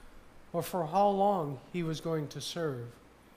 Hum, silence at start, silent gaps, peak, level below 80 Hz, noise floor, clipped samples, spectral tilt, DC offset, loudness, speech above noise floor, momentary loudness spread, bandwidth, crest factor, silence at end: none; 0 s; none; -16 dBFS; -60 dBFS; -52 dBFS; under 0.1%; -6 dB/octave; under 0.1%; -32 LUFS; 21 dB; 11 LU; 15.5 kHz; 16 dB; 0.45 s